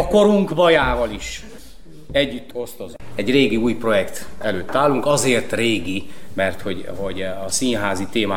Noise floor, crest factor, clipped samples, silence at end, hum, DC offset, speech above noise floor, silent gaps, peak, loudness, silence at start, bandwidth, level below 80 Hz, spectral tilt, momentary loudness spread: -42 dBFS; 16 dB; under 0.1%; 0 s; none; 4%; 23 dB; none; -4 dBFS; -20 LUFS; 0 s; 16.5 kHz; -40 dBFS; -4 dB/octave; 15 LU